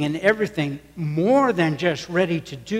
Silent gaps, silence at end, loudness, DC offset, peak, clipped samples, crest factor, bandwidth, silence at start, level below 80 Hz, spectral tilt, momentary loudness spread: none; 0 s; -22 LUFS; under 0.1%; -6 dBFS; under 0.1%; 16 dB; 15.5 kHz; 0 s; -56 dBFS; -6.5 dB/octave; 10 LU